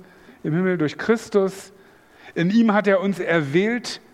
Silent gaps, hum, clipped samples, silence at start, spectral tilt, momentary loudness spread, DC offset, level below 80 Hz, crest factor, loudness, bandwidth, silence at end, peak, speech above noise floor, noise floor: none; none; under 0.1%; 0.3 s; -6.5 dB/octave; 10 LU; under 0.1%; -66 dBFS; 16 dB; -21 LUFS; 13.5 kHz; 0.15 s; -4 dBFS; 30 dB; -50 dBFS